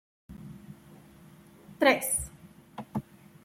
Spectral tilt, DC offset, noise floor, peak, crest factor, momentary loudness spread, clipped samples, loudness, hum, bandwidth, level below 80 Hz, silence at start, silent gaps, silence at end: -3 dB/octave; under 0.1%; -54 dBFS; -8 dBFS; 26 dB; 26 LU; under 0.1%; -28 LUFS; none; 16.5 kHz; -56 dBFS; 0.3 s; none; 0.45 s